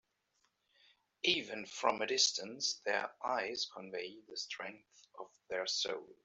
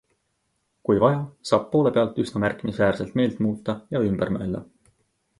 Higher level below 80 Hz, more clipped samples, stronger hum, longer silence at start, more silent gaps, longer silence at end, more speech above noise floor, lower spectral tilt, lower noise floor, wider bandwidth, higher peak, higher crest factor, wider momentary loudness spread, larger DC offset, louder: second, -84 dBFS vs -52 dBFS; neither; neither; first, 1.25 s vs 0.9 s; neither; second, 0.1 s vs 0.75 s; second, 41 dB vs 50 dB; second, -0.5 dB/octave vs -7.5 dB/octave; first, -80 dBFS vs -73 dBFS; second, 8.2 kHz vs 11.5 kHz; second, -16 dBFS vs -6 dBFS; about the same, 24 dB vs 20 dB; first, 14 LU vs 8 LU; neither; second, -36 LUFS vs -24 LUFS